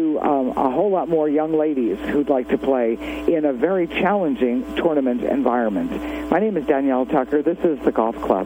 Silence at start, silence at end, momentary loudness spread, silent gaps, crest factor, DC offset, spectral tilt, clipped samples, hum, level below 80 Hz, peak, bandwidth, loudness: 0 s; 0 s; 3 LU; none; 18 dB; under 0.1%; -7.5 dB/octave; under 0.1%; none; -46 dBFS; -2 dBFS; 16.5 kHz; -20 LUFS